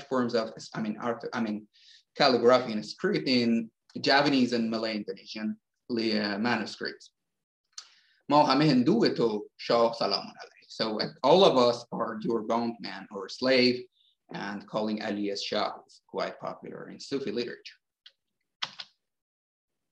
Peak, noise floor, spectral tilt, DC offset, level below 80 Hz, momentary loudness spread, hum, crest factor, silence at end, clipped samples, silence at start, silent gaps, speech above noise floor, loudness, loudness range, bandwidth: -8 dBFS; -61 dBFS; -5.5 dB/octave; under 0.1%; -76 dBFS; 17 LU; none; 22 dB; 1.1 s; under 0.1%; 0 s; 7.44-7.64 s, 18.55-18.60 s; 33 dB; -27 LUFS; 9 LU; 9.2 kHz